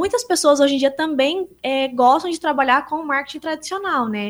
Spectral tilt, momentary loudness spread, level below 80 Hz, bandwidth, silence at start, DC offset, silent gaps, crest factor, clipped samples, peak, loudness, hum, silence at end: -2.5 dB/octave; 9 LU; -58 dBFS; over 20 kHz; 0 s; under 0.1%; none; 16 dB; under 0.1%; -2 dBFS; -19 LUFS; none; 0 s